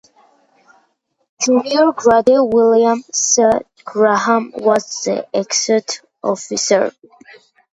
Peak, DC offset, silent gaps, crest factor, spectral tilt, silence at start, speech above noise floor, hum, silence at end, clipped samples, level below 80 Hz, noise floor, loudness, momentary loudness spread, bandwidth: 0 dBFS; under 0.1%; none; 16 dB; -2.5 dB/octave; 1.4 s; 49 dB; none; 0.85 s; under 0.1%; -56 dBFS; -64 dBFS; -15 LUFS; 9 LU; 9.2 kHz